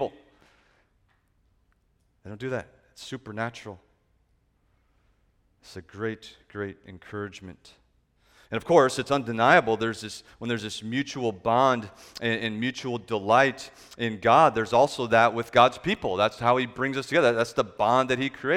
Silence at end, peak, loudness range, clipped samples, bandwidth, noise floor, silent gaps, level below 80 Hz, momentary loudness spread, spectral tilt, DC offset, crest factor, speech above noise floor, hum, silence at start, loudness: 0 s; -4 dBFS; 18 LU; under 0.1%; 15.5 kHz; -68 dBFS; none; -60 dBFS; 20 LU; -5 dB/octave; under 0.1%; 22 dB; 43 dB; none; 0 s; -24 LUFS